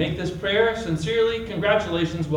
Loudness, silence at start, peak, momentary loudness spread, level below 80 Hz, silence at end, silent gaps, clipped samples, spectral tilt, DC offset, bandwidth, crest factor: -23 LUFS; 0 s; -6 dBFS; 5 LU; -46 dBFS; 0 s; none; under 0.1%; -6 dB/octave; under 0.1%; 11 kHz; 16 dB